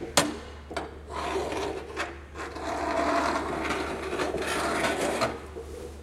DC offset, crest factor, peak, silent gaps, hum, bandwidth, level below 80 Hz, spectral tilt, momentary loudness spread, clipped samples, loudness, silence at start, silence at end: under 0.1%; 26 dB; -6 dBFS; none; none; 16 kHz; -46 dBFS; -3.5 dB/octave; 13 LU; under 0.1%; -30 LUFS; 0 s; 0 s